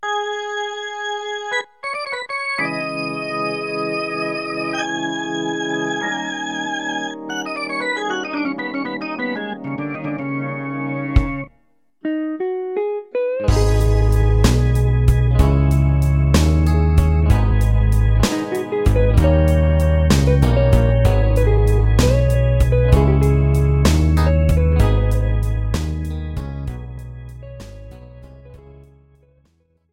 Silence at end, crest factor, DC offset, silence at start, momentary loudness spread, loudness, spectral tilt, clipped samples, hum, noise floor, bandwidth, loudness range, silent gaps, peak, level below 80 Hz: 1.35 s; 16 dB; 0.1%; 0 s; 11 LU; -18 LUFS; -6.5 dB/octave; under 0.1%; none; -62 dBFS; 16 kHz; 9 LU; none; 0 dBFS; -20 dBFS